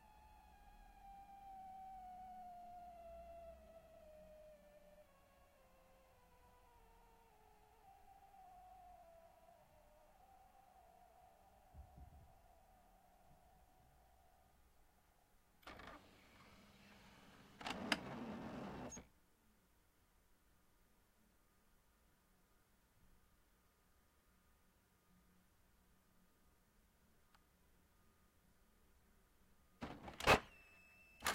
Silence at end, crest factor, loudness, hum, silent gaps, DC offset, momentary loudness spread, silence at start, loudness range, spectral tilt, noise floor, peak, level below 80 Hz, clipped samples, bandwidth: 0 s; 36 dB; -45 LUFS; none; none; under 0.1%; 25 LU; 0 s; 19 LU; -3.5 dB/octave; -76 dBFS; -18 dBFS; -68 dBFS; under 0.1%; 16 kHz